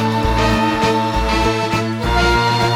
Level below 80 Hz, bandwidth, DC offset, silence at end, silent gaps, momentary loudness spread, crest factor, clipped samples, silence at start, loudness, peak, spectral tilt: -24 dBFS; 16.5 kHz; under 0.1%; 0 s; none; 4 LU; 14 dB; under 0.1%; 0 s; -16 LUFS; -2 dBFS; -5.5 dB/octave